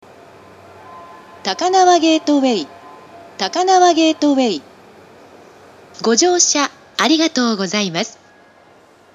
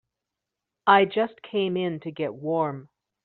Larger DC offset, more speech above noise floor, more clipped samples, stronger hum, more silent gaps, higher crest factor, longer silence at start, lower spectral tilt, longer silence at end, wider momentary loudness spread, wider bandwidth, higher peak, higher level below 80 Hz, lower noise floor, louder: neither; second, 33 dB vs 62 dB; neither; neither; neither; about the same, 18 dB vs 22 dB; about the same, 0.85 s vs 0.85 s; about the same, -2.5 dB/octave vs -3.5 dB/octave; first, 1.05 s vs 0.4 s; about the same, 12 LU vs 12 LU; first, 13 kHz vs 4.5 kHz; first, 0 dBFS vs -4 dBFS; about the same, -70 dBFS vs -72 dBFS; second, -48 dBFS vs -86 dBFS; first, -15 LUFS vs -25 LUFS